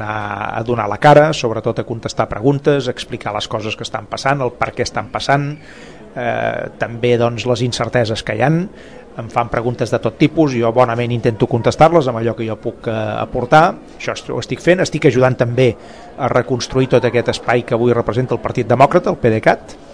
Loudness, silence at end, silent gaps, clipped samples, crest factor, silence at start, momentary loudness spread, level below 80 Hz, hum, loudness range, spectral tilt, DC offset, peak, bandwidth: -16 LUFS; 0 s; none; 0.2%; 16 dB; 0 s; 11 LU; -42 dBFS; none; 4 LU; -6 dB/octave; 0.5%; 0 dBFS; 10.5 kHz